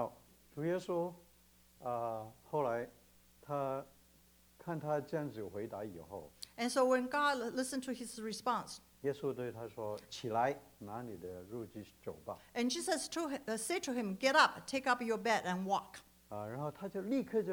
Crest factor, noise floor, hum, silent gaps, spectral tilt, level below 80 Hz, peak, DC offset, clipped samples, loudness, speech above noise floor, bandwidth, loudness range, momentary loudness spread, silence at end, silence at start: 26 dB; -67 dBFS; none; none; -4 dB/octave; -74 dBFS; -14 dBFS; under 0.1%; under 0.1%; -38 LUFS; 29 dB; over 20 kHz; 8 LU; 16 LU; 0 s; 0 s